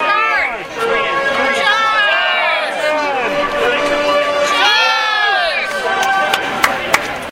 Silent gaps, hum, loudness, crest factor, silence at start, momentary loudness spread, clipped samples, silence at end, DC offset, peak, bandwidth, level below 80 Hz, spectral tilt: none; none; -14 LUFS; 14 dB; 0 s; 5 LU; under 0.1%; 0 s; under 0.1%; 0 dBFS; 16 kHz; -46 dBFS; -1.5 dB/octave